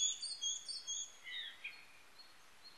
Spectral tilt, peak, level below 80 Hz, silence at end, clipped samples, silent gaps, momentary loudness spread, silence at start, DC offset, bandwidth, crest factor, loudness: 4 dB/octave; -24 dBFS; -86 dBFS; 0 s; under 0.1%; none; 20 LU; 0 s; under 0.1%; 12.5 kHz; 20 dB; -42 LUFS